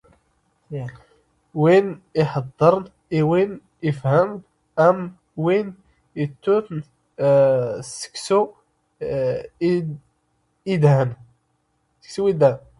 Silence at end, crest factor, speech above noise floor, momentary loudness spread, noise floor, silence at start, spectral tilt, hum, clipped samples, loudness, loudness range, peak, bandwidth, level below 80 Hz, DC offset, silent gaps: 0.2 s; 18 dB; 49 dB; 17 LU; -69 dBFS; 0.7 s; -7 dB/octave; none; under 0.1%; -20 LUFS; 3 LU; -2 dBFS; 11.5 kHz; -58 dBFS; under 0.1%; none